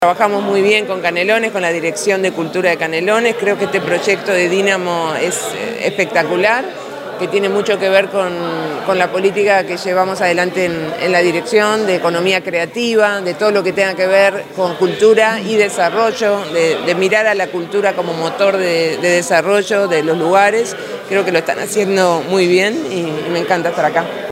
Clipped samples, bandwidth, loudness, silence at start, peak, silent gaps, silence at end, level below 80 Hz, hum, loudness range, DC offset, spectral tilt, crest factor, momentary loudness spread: under 0.1%; 16 kHz; -14 LUFS; 0 s; 0 dBFS; none; 0 s; -62 dBFS; none; 2 LU; under 0.1%; -4 dB/octave; 14 dB; 6 LU